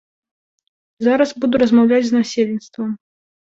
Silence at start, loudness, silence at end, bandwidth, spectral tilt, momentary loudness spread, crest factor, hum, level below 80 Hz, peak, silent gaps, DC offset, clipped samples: 1 s; -17 LUFS; 0.55 s; 7.6 kHz; -5.5 dB/octave; 13 LU; 16 dB; none; -58 dBFS; -2 dBFS; none; under 0.1%; under 0.1%